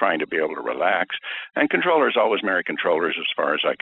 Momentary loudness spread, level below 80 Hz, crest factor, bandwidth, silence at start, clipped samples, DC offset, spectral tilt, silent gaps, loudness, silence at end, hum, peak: 7 LU; -70 dBFS; 18 dB; 4.1 kHz; 0 s; under 0.1%; under 0.1%; -6.5 dB/octave; none; -22 LUFS; 0.05 s; none; -4 dBFS